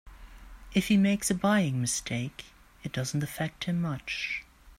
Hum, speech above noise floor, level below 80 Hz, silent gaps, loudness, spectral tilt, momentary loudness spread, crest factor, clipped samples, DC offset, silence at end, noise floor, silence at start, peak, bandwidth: none; 19 dB; -52 dBFS; none; -29 LUFS; -4.5 dB/octave; 12 LU; 18 dB; under 0.1%; under 0.1%; 0.05 s; -48 dBFS; 0.05 s; -12 dBFS; 16 kHz